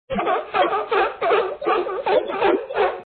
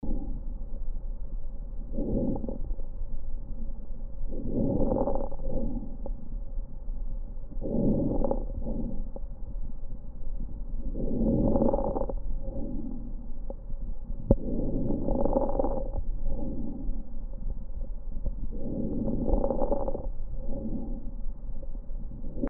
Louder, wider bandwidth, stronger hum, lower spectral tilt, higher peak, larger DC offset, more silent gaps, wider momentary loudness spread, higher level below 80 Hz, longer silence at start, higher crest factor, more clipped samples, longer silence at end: first, -21 LUFS vs -34 LUFS; first, 4.6 kHz vs 1.5 kHz; neither; second, -8 dB/octave vs -11 dB/octave; about the same, -6 dBFS vs -4 dBFS; neither; neither; second, 3 LU vs 15 LU; second, -54 dBFS vs -32 dBFS; about the same, 0.1 s vs 0 s; second, 14 dB vs 24 dB; neither; about the same, 0.05 s vs 0 s